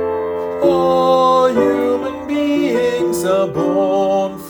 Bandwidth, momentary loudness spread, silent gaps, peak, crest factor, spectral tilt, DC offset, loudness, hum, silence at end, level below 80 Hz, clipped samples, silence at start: over 20 kHz; 8 LU; none; -2 dBFS; 14 dB; -5.5 dB/octave; under 0.1%; -15 LUFS; none; 0 s; -52 dBFS; under 0.1%; 0 s